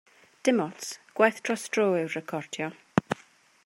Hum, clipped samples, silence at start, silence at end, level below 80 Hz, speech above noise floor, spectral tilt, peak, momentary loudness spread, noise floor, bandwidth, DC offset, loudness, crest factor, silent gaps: none; under 0.1%; 0.45 s; 0.5 s; -70 dBFS; 31 dB; -4.5 dB/octave; -4 dBFS; 12 LU; -58 dBFS; 16 kHz; under 0.1%; -28 LUFS; 26 dB; none